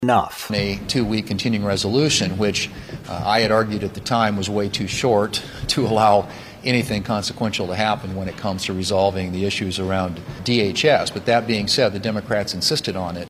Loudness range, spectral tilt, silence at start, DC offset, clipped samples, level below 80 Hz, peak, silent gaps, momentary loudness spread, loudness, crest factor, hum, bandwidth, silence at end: 3 LU; -4.5 dB/octave; 0 s; under 0.1%; under 0.1%; -46 dBFS; -4 dBFS; none; 8 LU; -20 LUFS; 18 dB; none; 15.5 kHz; 0 s